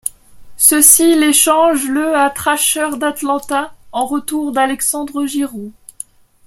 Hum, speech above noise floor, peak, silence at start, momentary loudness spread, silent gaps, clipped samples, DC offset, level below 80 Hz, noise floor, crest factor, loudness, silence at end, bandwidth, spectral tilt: none; 22 dB; 0 dBFS; 0.05 s; 19 LU; none; 0.2%; under 0.1%; -50 dBFS; -36 dBFS; 14 dB; -13 LUFS; 0.75 s; 16.5 kHz; -1 dB/octave